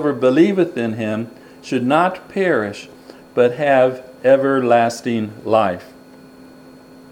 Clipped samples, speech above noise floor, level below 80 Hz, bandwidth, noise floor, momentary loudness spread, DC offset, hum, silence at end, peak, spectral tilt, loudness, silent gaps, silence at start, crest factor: under 0.1%; 26 dB; -62 dBFS; 16 kHz; -42 dBFS; 12 LU; under 0.1%; none; 1.2 s; 0 dBFS; -6.5 dB/octave; -17 LUFS; none; 0 s; 18 dB